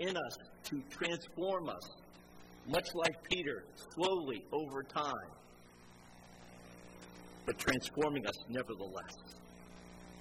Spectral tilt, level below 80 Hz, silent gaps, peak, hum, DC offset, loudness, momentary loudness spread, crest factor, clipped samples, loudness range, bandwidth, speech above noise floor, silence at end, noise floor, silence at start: -4 dB/octave; -64 dBFS; none; -16 dBFS; 60 Hz at -65 dBFS; under 0.1%; -39 LUFS; 23 LU; 24 dB; under 0.1%; 4 LU; 16 kHz; 20 dB; 0 s; -59 dBFS; 0 s